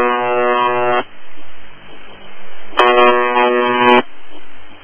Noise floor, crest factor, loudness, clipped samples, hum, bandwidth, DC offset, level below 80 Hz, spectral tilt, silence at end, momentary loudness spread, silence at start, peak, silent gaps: -34 dBFS; 14 dB; -13 LUFS; under 0.1%; none; 7.2 kHz; under 0.1%; -48 dBFS; -5.5 dB/octave; 0.05 s; 10 LU; 0 s; 0 dBFS; none